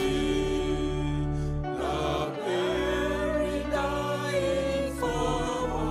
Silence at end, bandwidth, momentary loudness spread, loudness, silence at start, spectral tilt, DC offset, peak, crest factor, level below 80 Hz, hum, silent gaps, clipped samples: 0 s; 15 kHz; 3 LU; -29 LUFS; 0 s; -5.5 dB/octave; under 0.1%; -14 dBFS; 14 dB; -38 dBFS; none; none; under 0.1%